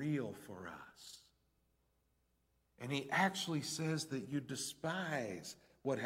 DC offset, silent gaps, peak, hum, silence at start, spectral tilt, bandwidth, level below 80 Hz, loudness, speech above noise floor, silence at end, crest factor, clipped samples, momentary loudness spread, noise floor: under 0.1%; none; -18 dBFS; none; 0 s; -4.5 dB/octave; 16.5 kHz; -78 dBFS; -40 LUFS; 38 dB; 0 s; 24 dB; under 0.1%; 18 LU; -79 dBFS